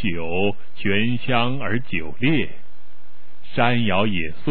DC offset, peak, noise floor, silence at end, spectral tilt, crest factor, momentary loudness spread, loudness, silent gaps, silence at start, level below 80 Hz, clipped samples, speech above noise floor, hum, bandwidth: 10%; -4 dBFS; -56 dBFS; 0 s; -9.5 dB/octave; 20 dB; 7 LU; -22 LUFS; none; 0 s; -50 dBFS; under 0.1%; 34 dB; none; 4.6 kHz